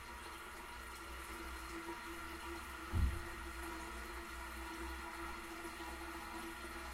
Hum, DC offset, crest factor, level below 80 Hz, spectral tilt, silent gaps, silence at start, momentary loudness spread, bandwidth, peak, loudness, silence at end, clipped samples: none; under 0.1%; 22 dB; -50 dBFS; -4.5 dB/octave; none; 0 s; 8 LU; 16 kHz; -24 dBFS; -46 LUFS; 0 s; under 0.1%